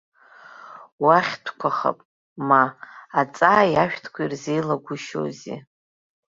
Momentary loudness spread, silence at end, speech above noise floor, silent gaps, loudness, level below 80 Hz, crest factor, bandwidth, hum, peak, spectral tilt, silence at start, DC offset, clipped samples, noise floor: 19 LU; 0.8 s; 25 dB; 0.92-0.98 s, 2.05-2.36 s; -22 LUFS; -64 dBFS; 22 dB; 7.8 kHz; none; -2 dBFS; -5.5 dB/octave; 0.6 s; under 0.1%; under 0.1%; -47 dBFS